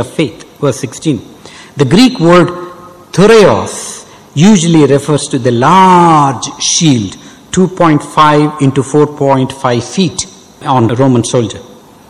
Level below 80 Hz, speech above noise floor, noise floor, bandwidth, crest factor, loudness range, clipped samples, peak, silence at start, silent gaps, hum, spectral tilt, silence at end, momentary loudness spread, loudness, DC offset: -42 dBFS; 22 dB; -31 dBFS; 14 kHz; 10 dB; 3 LU; 0.1%; 0 dBFS; 0 s; none; none; -5 dB/octave; 0.5 s; 14 LU; -9 LUFS; under 0.1%